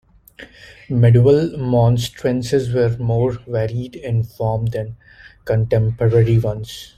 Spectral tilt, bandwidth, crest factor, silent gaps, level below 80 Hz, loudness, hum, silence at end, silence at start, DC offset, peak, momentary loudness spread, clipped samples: -8 dB/octave; 13.5 kHz; 16 dB; none; -42 dBFS; -18 LUFS; none; 0.1 s; 0.4 s; under 0.1%; -2 dBFS; 11 LU; under 0.1%